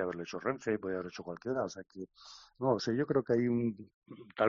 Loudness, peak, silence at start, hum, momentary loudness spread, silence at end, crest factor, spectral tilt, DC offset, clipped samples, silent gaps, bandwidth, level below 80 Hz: -34 LUFS; -14 dBFS; 0 s; none; 20 LU; 0 s; 20 dB; -5.5 dB/octave; under 0.1%; under 0.1%; 3.94-4.02 s; 7.2 kHz; -70 dBFS